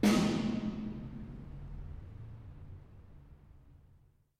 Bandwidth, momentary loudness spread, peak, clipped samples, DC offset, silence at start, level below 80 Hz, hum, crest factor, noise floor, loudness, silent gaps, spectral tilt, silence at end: 15.5 kHz; 26 LU; -16 dBFS; under 0.1%; under 0.1%; 0 s; -52 dBFS; none; 22 dB; -65 dBFS; -37 LUFS; none; -5.5 dB/octave; 0.6 s